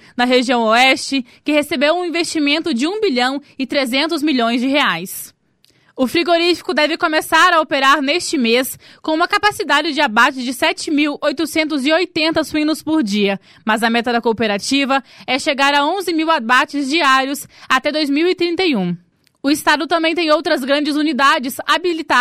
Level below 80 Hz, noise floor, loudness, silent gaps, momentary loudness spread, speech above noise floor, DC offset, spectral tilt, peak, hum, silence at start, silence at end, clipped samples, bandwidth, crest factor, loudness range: -56 dBFS; -57 dBFS; -16 LUFS; none; 7 LU; 41 dB; under 0.1%; -3 dB/octave; -2 dBFS; none; 0.15 s; 0 s; under 0.1%; 16 kHz; 14 dB; 3 LU